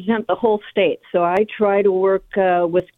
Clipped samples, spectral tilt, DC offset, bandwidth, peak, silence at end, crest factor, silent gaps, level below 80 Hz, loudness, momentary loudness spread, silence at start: under 0.1%; -8 dB/octave; under 0.1%; 4.1 kHz; -4 dBFS; 0.15 s; 14 dB; none; -56 dBFS; -18 LUFS; 3 LU; 0 s